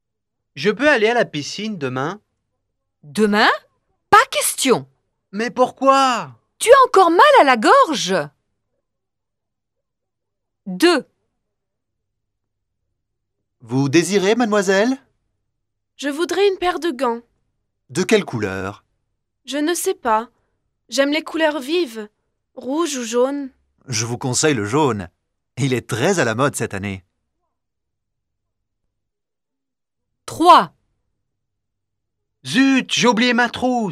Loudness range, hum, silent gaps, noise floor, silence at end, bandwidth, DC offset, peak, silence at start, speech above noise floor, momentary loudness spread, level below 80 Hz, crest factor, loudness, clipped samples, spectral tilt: 10 LU; none; none; -84 dBFS; 0 s; 16 kHz; under 0.1%; 0 dBFS; 0.55 s; 68 dB; 16 LU; -60 dBFS; 20 dB; -17 LUFS; under 0.1%; -4 dB/octave